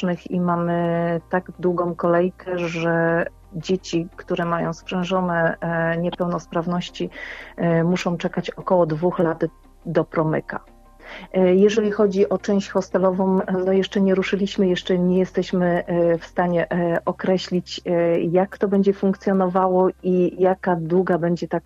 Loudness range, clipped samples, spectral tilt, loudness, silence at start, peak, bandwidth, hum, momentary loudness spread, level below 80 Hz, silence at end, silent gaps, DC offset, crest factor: 4 LU; under 0.1%; -7 dB/octave; -21 LUFS; 0 s; -4 dBFS; 7.8 kHz; none; 8 LU; -50 dBFS; 0.05 s; none; under 0.1%; 16 dB